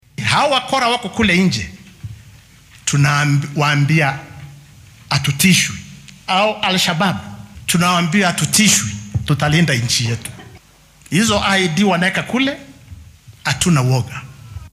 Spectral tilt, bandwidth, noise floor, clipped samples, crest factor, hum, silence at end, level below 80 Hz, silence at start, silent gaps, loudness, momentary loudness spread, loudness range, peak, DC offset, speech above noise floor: -4 dB/octave; 16 kHz; -47 dBFS; under 0.1%; 16 dB; none; 0.05 s; -44 dBFS; 0.2 s; none; -15 LUFS; 19 LU; 3 LU; 0 dBFS; under 0.1%; 31 dB